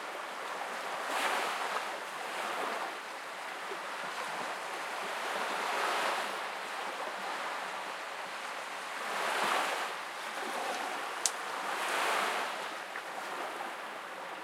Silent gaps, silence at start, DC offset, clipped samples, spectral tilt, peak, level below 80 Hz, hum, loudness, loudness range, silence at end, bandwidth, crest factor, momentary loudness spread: none; 0 s; under 0.1%; under 0.1%; -0.5 dB/octave; -2 dBFS; under -90 dBFS; none; -35 LUFS; 3 LU; 0 s; 16.5 kHz; 34 dB; 8 LU